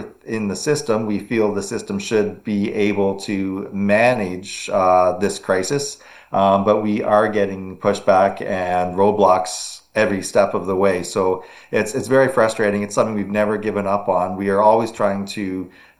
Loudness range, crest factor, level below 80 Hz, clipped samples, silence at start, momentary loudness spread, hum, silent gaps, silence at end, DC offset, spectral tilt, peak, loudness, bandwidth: 2 LU; 18 dB; -56 dBFS; under 0.1%; 0 s; 10 LU; none; none; 0.3 s; under 0.1%; -5 dB/octave; 0 dBFS; -19 LUFS; 12.5 kHz